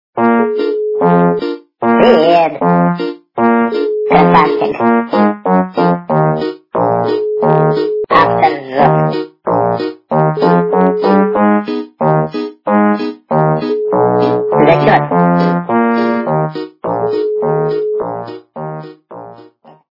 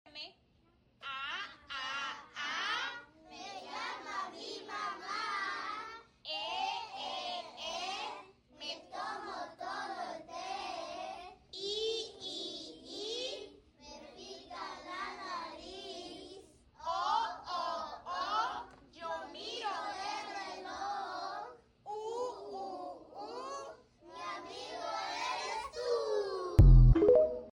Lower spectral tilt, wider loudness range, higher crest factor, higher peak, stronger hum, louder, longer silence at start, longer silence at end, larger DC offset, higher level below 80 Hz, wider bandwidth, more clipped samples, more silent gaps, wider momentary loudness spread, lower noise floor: first, -9.5 dB/octave vs -5.5 dB/octave; second, 3 LU vs 6 LU; second, 12 dB vs 22 dB; first, 0 dBFS vs -12 dBFS; neither; first, -13 LUFS vs -36 LUFS; about the same, 0.15 s vs 0.05 s; first, 0.55 s vs 0 s; neither; second, -50 dBFS vs -40 dBFS; second, 5.8 kHz vs 9.8 kHz; neither; neither; second, 10 LU vs 14 LU; second, -41 dBFS vs -69 dBFS